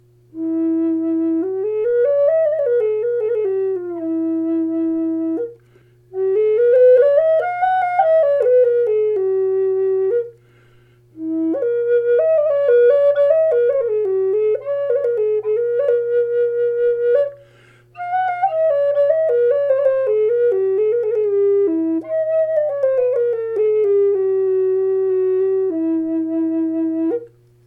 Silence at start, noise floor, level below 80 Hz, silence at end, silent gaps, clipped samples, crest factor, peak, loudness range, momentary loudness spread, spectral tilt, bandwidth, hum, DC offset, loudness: 0.35 s; -51 dBFS; -66 dBFS; 0.4 s; none; under 0.1%; 14 dB; -4 dBFS; 4 LU; 7 LU; -8.5 dB/octave; 4 kHz; none; under 0.1%; -17 LUFS